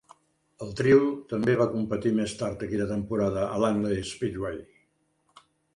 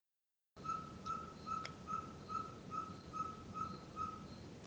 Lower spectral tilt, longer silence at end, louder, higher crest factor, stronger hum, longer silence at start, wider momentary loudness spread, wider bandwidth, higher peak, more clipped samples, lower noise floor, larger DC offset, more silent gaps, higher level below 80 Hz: about the same, -6.5 dB/octave vs -5.5 dB/octave; first, 1.1 s vs 0 s; first, -27 LUFS vs -46 LUFS; about the same, 20 dB vs 22 dB; neither; about the same, 0.6 s vs 0.55 s; first, 13 LU vs 3 LU; second, 11 kHz vs over 20 kHz; first, -8 dBFS vs -26 dBFS; neither; second, -71 dBFS vs -89 dBFS; neither; neither; first, -54 dBFS vs -68 dBFS